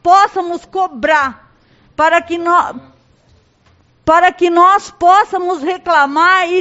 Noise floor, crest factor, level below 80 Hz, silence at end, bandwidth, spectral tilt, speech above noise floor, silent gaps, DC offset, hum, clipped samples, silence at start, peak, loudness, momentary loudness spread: -52 dBFS; 14 dB; -50 dBFS; 0 s; 8.2 kHz; -3.5 dB/octave; 40 dB; none; under 0.1%; none; under 0.1%; 0.05 s; 0 dBFS; -12 LUFS; 11 LU